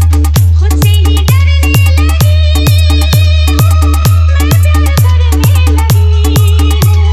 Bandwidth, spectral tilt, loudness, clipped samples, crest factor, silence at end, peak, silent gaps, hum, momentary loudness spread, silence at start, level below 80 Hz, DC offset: 15 kHz; -5.5 dB/octave; -8 LUFS; 0.2%; 6 dB; 0 s; 0 dBFS; none; none; 1 LU; 0 s; -12 dBFS; under 0.1%